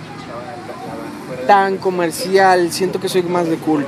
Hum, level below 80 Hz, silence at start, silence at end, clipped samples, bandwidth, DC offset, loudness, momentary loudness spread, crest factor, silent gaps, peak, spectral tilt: none; -56 dBFS; 0 s; 0 s; under 0.1%; 15.5 kHz; under 0.1%; -16 LUFS; 17 LU; 16 dB; none; 0 dBFS; -4.5 dB/octave